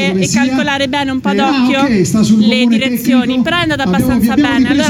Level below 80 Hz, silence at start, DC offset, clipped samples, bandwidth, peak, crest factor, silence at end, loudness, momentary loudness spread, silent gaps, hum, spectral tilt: -38 dBFS; 0 s; under 0.1%; under 0.1%; 16.5 kHz; 0 dBFS; 10 dB; 0 s; -12 LUFS; 4 LU; none; none; -5 dB/octave